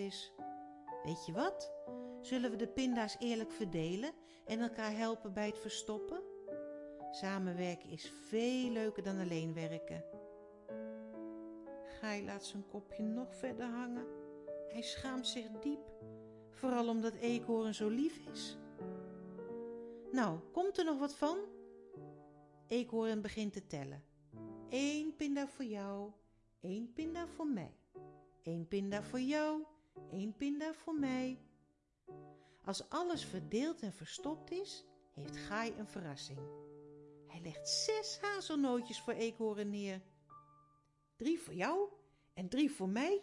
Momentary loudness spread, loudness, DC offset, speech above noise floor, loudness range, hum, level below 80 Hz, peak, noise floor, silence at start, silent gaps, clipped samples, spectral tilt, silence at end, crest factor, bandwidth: 16 LU; -41 LUFS; under 0.1%; 36 dB; 5 LU; none; -72 dBFS; -22 dBFS; -76 dBFS; 0 s; none; under 0.1%; -5 dB/octave; 0 s; 20 dB; 11.5 kHz